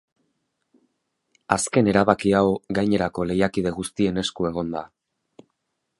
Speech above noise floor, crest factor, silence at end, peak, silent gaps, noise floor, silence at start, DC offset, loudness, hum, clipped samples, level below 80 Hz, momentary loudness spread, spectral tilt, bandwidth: 55 dB; 24 dB; 1.15 s; 0 dBFS; none; -77 dBFS; 1.5 s; under 0.1%; -22 LUFS; none; under 0.1%; -50 dBFS; 8 LU; -5.5 dB/octave; 11.5 kHz